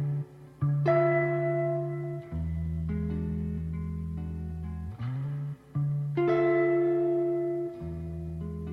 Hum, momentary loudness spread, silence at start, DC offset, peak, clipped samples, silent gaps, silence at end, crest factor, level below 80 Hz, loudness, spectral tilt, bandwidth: none; 12 LU; 0 s; under 0.1%; -14 dBFS; under 0.1%; none; 0 s; 16 dB; -44 dBFS; -30 LUFS; -10.5 dB/octave; 5.2 kHz